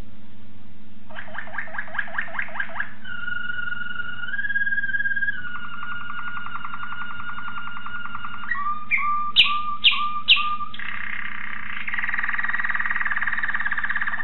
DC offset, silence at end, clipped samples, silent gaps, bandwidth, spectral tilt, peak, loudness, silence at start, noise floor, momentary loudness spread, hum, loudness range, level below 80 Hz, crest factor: 7%; 0 s; under 0.1%; none; 4.5 kHz; 2 dB/octave; -4 dBFS; -24 LUFS; 0 s; -48 dBFS; 15 LU; none; 10 LU; -58 dBFS; 24 dB